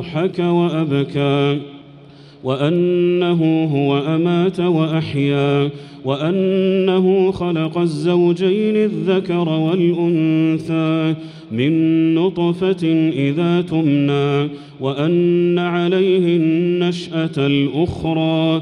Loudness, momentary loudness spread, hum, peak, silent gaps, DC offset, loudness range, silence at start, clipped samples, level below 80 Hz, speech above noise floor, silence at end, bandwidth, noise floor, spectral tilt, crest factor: -17 LUFS; 5 LU; none; -4 dBFS; none; under 0.1%; 1 LU; 0 s; under 0.1%; -52 dBFS; 25 dB; 0 s; 10.5 kHz; -41 dBFS; -8 dB/octave; 12 dB